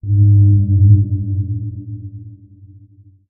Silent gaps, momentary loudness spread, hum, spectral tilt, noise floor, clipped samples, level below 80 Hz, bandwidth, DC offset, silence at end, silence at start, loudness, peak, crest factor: none; 20 LU; none; -24.5 dB/octave; -46 dBFS; under 0.1%; -38 dBFS; 0.6 kHz; under 0.1%; 0.95 s; 0.05 s; -13 LUFS; 0 dBFS; 14 dB